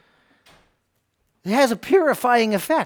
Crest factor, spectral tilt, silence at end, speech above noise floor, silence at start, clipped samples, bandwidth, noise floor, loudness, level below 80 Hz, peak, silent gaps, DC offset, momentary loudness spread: 16 dB; -4.5 dB/octave; 0 s; 52 dB; 1.45 s; under 0.1%; over 20 kHz; -71 dBFS; -19 LUFS; -64 dBFS; -4 dBFS; none; under 0.1%; 5 LU